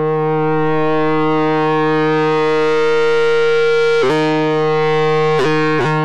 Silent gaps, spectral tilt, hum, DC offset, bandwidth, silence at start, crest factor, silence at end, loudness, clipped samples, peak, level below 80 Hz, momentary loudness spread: none; -6.5 dB/octave; none; 5%; 8.8 kHz; 0 s; 4 dB; 0 s; -14 LUFS; under 0.1%; -8 dBFS; -54 dBFS; 2 LU